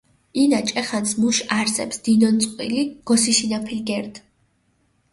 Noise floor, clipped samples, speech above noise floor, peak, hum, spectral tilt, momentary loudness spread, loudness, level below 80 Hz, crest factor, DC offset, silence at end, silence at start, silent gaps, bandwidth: -65 dBFS; under 0.1%; 45 dB; -4 dBFS; none; -3 dB/octave; 9 LU; -20 LUFS; -60 dBFS; 16 dB; under 0.1%; 0.95 s; 0.35 s; none; 11.5 kHz